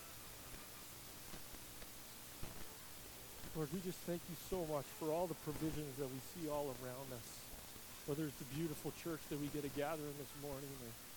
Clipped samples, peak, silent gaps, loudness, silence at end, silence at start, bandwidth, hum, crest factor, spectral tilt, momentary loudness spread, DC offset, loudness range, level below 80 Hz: under 0.1%; -28 dBFS; none; -47 LUFS; 0 s; 0 s; 19 kHz; none; 18 dB; -4.5 dB/octave; 9 LU; under 0.1%; 6 LU; -64 dBFS